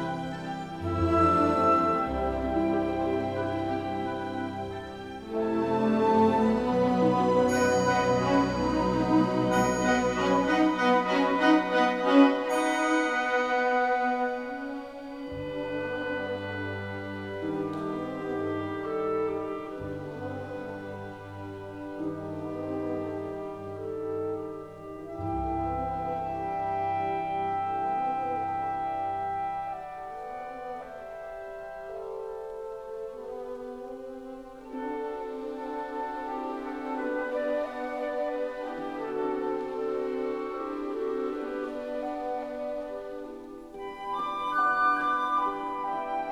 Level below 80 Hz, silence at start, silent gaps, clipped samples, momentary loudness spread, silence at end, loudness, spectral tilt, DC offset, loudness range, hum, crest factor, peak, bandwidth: -52 dBFS; 0 s; none; under 0.1%; 15 LU; 0 s; -29 LUFS; -6 dB/octave; under 0.1%; 12 LU; none; 22 dB; -6 dBFS; 13.5 kHz